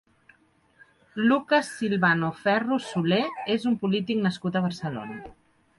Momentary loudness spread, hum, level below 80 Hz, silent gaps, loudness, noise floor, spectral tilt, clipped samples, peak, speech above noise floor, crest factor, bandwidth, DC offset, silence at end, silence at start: 11 LU; none; -64 dBFS; none; -25 LUFS; -62 dBFS; -6 dB/octave; under 0.1%; -10 dBFS; 37 dB; 18 dB; 11.5 kHz; under 0.1%; 0.45 s; 1.15 s